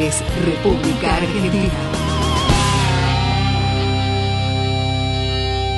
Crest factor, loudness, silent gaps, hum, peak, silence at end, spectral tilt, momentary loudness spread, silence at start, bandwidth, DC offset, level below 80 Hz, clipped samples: 16 dB; -18 LUFS; none; none; -2 dBFS; 0 s; -5 dB/octave; 3 LU; 0 s; 12 kHz; under 0.1%; -26 dBFS; under 0.1%